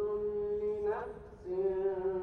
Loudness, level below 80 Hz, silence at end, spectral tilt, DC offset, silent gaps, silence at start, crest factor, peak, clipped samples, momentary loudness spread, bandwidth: -35 LUFS; -58 dBFS; 0 s; -9 dB/octave; under 0.1%; none; 0 s; 12 dB; -24 dBFS; under 0.1%; 8 LU; 4.3 kHz